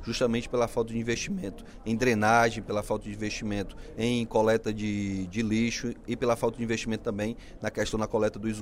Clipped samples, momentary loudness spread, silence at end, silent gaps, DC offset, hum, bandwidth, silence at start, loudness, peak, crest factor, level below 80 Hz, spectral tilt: under 0.1%; 9 LU; 0 s; none; under 0.1%; none; 16 kHz; 0 s; -29 LUFS; -10 dBFS; 20 dB; -46 dBFS; -5 dB/octave